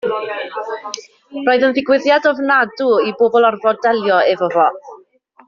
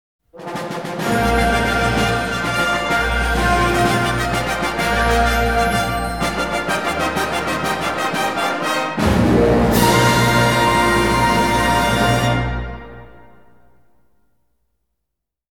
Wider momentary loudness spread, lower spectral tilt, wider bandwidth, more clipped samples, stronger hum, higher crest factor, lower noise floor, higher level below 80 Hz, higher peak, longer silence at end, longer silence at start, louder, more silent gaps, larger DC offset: first, 13 LU vs 7 LU; second, -1.5 dB/octave vs -4.5 dB/octave; second, 7.2 kHz vs 19.5 kHz; neither; neither; about the same, 14 dB vs 18 dB; second, -49 dBFS vs -80 dBFS; second, -64 dBFS vs -30 dBFS; about the same, -2 dBFS vs 0 dBFS; second, 0.5 s vs 2.4 s; second, 0.05 s vs 0.35 s; about the same, -15 LUFS vs -17 LUFS; neither; second, under 0.1% vs 0.5%